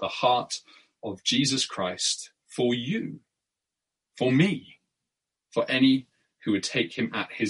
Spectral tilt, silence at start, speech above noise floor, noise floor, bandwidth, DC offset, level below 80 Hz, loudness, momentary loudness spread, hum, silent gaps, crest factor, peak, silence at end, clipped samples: -4 dB/octave; 0 s; 61 dB; -87 dBFS; 11.5 kHz; under 0.1%; -70 dBFS; -26 LUFS; 13 LU; none; none; 20 dB; -8 dBFS; 0 s; under 0.1%